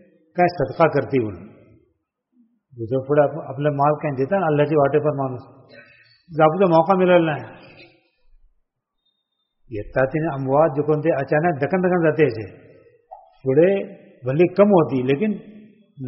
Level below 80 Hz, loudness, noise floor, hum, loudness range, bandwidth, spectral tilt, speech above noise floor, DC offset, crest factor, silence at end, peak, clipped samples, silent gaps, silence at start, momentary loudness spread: -54 dBFS; -19 LUFS; -74 dBFS; none; 4 LU; 5.8 kHz; -7 dB/octave; 55 dB; under 0.1%; 18 dB; 0 s; -2 dBFS; under 0.1%; none; 0.35 s; 16 LU